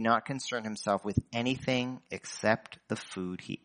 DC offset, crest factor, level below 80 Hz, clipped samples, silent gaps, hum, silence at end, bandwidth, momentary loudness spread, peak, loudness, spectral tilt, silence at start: under 0.1%; 24 dB; -58 dBFS; under 0.1%; none; none; 0.1 s; 10 kHz; 9 LU; -10 dBFS; -33 LUFS; -5 dB/octave; 0 s